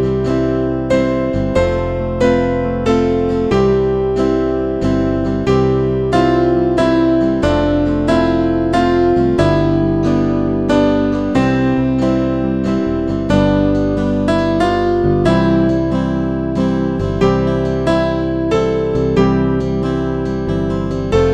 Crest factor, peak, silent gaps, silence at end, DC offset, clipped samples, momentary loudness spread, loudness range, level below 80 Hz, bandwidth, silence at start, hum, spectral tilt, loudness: 14 dB; 0 dBFS; none; 0 s; 0.7%; under 0.1%; 4 LU; 2 LU; -28 dBFS; 9.4 kHz; 0 s; none; -8 dB/octave; -15 LUFS